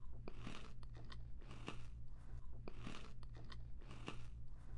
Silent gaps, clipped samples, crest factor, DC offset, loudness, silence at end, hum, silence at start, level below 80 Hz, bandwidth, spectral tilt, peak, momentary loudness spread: none; under 0.1%; 14 dB; under 0.1%; -56 LUFS; 0 s; none; 0 s; -54 dBFS; 10 kHz; -5.5 dB/octave; -32 dBFS; 4 LU